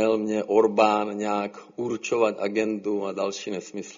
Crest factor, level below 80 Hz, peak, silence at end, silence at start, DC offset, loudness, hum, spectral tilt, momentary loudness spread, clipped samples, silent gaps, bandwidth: 20 dB; -70 dBFS; -6 dBFS; 0 s; 0 s; under 0.1%; -25 LUFS; none; -4 dB/octave; 12 LU; under 0.1%; none; 7.4 kHz